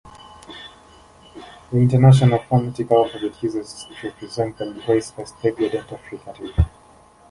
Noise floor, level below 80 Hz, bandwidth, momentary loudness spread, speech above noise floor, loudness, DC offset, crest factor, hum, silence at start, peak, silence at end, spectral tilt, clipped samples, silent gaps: -50 dBFS; -36 dBFS; 11.5 kHz; 24 LU; 31 dB; -20 LUFS; under 0.1%; 18 dB; none; 0.5 s; -2 dBFS; 0.6 s; -7.5 dB/octave; under 0.1%; none